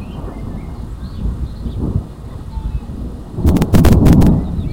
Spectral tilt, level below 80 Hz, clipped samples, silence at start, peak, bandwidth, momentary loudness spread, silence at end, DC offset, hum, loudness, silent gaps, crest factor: -8 dB/octave; -20 dBFS; under 0.1%; 0 s; 0 dBFS; 17 kHz; 19 LU; 0 s; under 0.1%; none; -15 LUFS; none; 14 dB